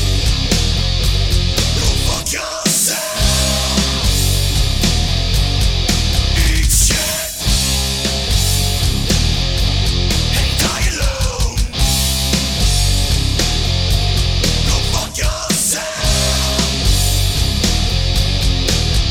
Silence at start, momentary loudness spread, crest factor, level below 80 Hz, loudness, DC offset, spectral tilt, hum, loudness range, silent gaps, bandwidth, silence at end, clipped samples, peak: 0 s; 3 LU; 12 dB; -18 dBFS; -15 LUFS; under 0.1%; -3 dB/octave; none; 1 LU; none; 18 kHz; 0 s; under 0.1%; -2 dBFS